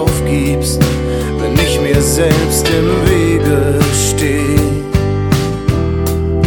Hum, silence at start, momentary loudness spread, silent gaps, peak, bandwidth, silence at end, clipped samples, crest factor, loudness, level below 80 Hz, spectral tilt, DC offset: none; 0 s; 4 LU; none; 0 dBFS; 19.5 kHz; 0 s; under 0.1%; 12 dB; -13 LUFS; -22 dBFS; -5.5 dB/octave; under 0.1%